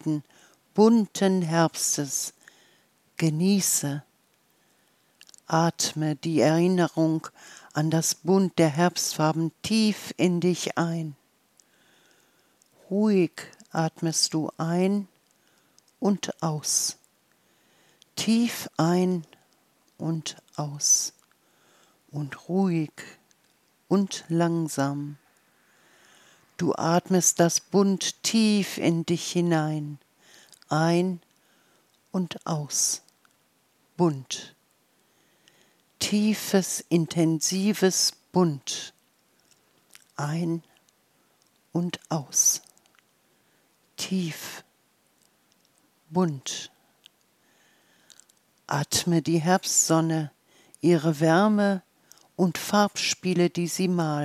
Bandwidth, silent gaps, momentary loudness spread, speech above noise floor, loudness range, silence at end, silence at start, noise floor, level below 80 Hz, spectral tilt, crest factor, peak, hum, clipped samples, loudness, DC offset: 15.5 kHz; none; 14 LU; 42 dB; 7 LU; 0 s; 0.05 s; -67 dBFS; -72 dBFS; -4.5 dB/octave; 20 dB; -6 dBFS; none; under 0.1%; -25 LUFS; under 0.1%